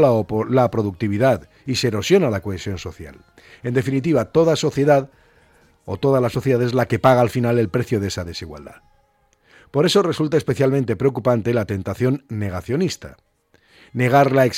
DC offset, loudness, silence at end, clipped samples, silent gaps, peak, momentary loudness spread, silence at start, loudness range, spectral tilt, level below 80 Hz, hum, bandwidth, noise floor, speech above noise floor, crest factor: under 0.1%; -19 LUFS; 0 s; under 0.1%; none; -4 dBFS; 14 LU; 0 s; 3 LU; -6.5 dB/octave; -50 dBFS; none; 16 kHz; -61 dBFS; 42 dB; 16 dB